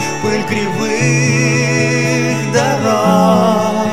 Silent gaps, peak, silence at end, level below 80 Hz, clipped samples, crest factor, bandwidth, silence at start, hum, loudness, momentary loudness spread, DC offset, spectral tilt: none; 0 dBFS; 0 s; -52 dBFS; under 0.1%; 14 dB; 15 kHz; 0 s; none; -13 LUFS; 6 LU; under 0.1%; -5 dB/octave